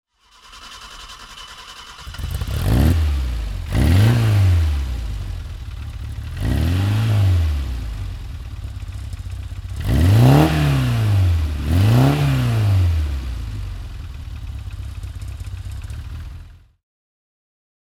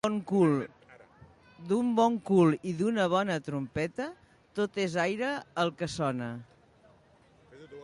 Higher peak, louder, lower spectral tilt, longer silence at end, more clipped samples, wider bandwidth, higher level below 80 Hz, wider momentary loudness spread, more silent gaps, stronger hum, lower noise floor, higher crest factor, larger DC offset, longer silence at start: first, 0 dBFS vs -12 dBFS; first, -18 LUFS vs -29 LUFS; about the same, -7 dB/octave vs -6.5 dB/octave; first, 1.3 s vs 0 s; neither; first, 16 kHz vs 11.5 kHz; first, -26 dBFS vs -66 dBFS; first, 21 LU vs 15 LU; neither; neither; second, -48 dBFS vs -61 dBFS; about the same, 18 dB vs 18 dB; neither; first, 0.5 s vs 0.05 s